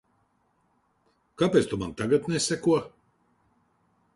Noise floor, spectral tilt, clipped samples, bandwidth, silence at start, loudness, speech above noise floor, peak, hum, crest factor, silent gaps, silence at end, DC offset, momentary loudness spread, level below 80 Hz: -70 dBFS; -5 dB/octave; under 0.1%; 11.5 kHz; 1.4 s; -26 LUFS; 45 dB; -8 dBFS; none; 22 dB; none; 1.25 s; under 0.1%; 7 LU; -58 dBFS